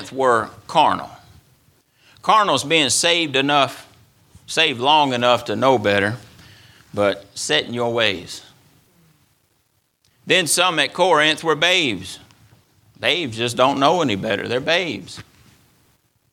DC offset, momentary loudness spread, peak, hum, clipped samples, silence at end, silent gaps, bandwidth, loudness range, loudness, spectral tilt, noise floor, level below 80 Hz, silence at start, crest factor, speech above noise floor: under 0.1%; 14 LU; 0 dBFS; none; under 0.1%; 1.1 s; none; 17 kHz; 5 LU; -18 LUFS; -3 dB/octave; -66 dBFS; -60 dBFS; 0 s; 20 dB; 47 dB